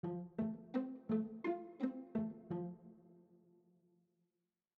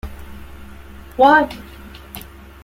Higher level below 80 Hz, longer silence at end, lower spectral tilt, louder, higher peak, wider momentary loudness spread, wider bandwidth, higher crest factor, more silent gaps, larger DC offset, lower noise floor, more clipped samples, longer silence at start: second, -80 dBFS vs -40 dBFS; first, 1.4 s vs 0.45 s; first, -8.5 dB/octave vs -5.5 dB/octave; second, -43 LUFS vs -14 LUFS; second, -26 dBFS vs -2 dBFS; second, 6 LU vs 27 LU; second, 4.8 kHz vs 16.5 kHz; about the same, 18 dB vs 18 dB; neither; neither; first, -90 dBFS vs -37 dBFS; neither; about the same, 0.05 s vs 0.05 s